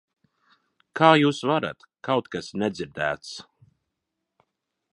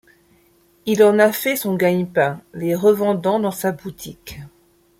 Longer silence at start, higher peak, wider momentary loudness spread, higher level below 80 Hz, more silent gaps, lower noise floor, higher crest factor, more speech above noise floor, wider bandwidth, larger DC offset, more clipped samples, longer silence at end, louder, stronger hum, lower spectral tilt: about the same, 0.95 s vs 0.85 s; about the same, -2 dBFS vs -2 dBFS; about the same, 20 LU vs 20 LU; second, -64 dBFS vs -56 dBFS; neither; first, -82 dBFS vs -57 dBFS; first, 24 dB vs 18 dB; first, 59 dB vs 38 dB; second, 11.5 kHz vs 16.5 kHz; neither; neither; first, 1.5 s vs 0.5 s; second, -23 LUFS vs -18 LUFS; neither; about the same, -5.5 dB/octave vs -5.5 dB/octave